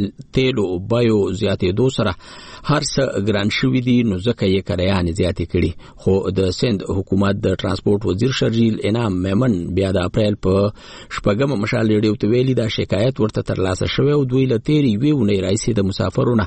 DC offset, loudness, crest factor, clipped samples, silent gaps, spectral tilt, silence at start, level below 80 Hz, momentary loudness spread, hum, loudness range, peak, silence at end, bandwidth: under 0.1%; -18 LUFS; 12 dB; under 0.1%; none; -6.5 dB/octave; 0 s; -40 dBFS; 4 LU; none; 1 LU; -4 dBFS; 0 s; 8.8 kHz